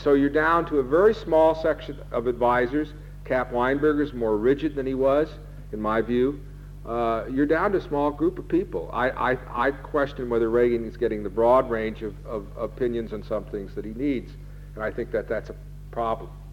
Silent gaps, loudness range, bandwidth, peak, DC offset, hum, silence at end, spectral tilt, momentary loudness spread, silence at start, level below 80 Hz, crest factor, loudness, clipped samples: none; 7 LU; 16.5 kHz; -8 dBFS; under 0.1%; none; 0 s; -8 dB/octave; 14 LU; 0 s; -42 dBFS; 16 dB; -25 LUFS; under 0.1%